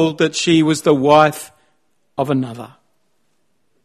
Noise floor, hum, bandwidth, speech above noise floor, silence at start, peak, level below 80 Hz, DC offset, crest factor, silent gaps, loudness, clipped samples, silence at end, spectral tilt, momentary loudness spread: -68 dBFS; none; 13.5 kHz; 53 dB; 0 s; 0 dBFS; -58 dBFS; under 0.1%; 18 dB; none; -15 LUFS; under 0.1%; 1.2 s; -5 dB/octave; 20 LU